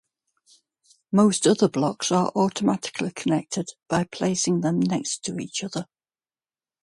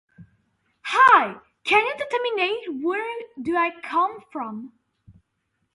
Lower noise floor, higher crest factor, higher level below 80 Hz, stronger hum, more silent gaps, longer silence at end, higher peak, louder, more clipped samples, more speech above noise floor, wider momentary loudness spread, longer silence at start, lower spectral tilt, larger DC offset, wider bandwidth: first, under -90 dBFS vs -74 dBFS; about the same, 18 dB vs 22 dB; about the same, -64 dBFS vs -66 dBFS; neither; neither; first, 1 s vs 0.65 s; second, -6 dBFS vs -2 dBFS; about the same, -24 LUFS vs -22 LUFS; neither; first, over 67 dB vs 53 dB; second, 10 LU vs 18 LU; first, 1.1 s vs 0.2 s; first, -5 dB/octave vs -3.5 dB/octave; neither; about the same, 11.5 kHz vs 11.5 kHz